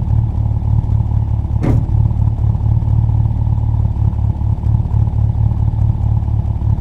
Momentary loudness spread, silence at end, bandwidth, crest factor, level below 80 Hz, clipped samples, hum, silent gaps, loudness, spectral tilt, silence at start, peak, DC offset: 3 LU; 0 s; 2.5 kHz; 14 dB; -18 dBFS; under 0.1%; none; none; -16 LUFS; -11 dB/octave; 0 s; 0 dBFS; under 0.1%